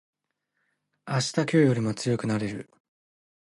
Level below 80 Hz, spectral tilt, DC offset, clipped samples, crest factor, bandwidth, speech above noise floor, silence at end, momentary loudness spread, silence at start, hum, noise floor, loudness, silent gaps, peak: -66 dBFS; -6 dB/octave; under 0.1%; under 0.1%; 20 dB; 11.5 kHz; 54 dB; 0.8 s; 10 LU; 1.05 s; 50 Hz at -55 dBFS; -79 dBFS; -26 LUFS; none; -8 dBFS